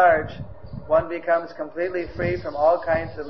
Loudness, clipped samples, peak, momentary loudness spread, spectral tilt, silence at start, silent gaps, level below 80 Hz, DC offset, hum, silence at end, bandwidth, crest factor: -23 LUFS; under 0.1%; -6 dBFS; 15 LU; -8.5 dB/octave; 0 s; none; -46 dBFS; 0.8%; none; 0 s; 6 kHz; 16 dB